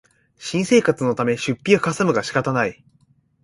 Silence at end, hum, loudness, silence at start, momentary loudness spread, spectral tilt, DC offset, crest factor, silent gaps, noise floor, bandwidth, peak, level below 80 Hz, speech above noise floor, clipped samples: 0.7 s; none; -20 LUFS; 0.4 s; 8 LU; -5.5 dB/octave; under 0.1%; 20 dB; none; -60 dBFS; 11.5 kHz; -2 dBFS; -58 dBFS; 40 dB; under 0.1%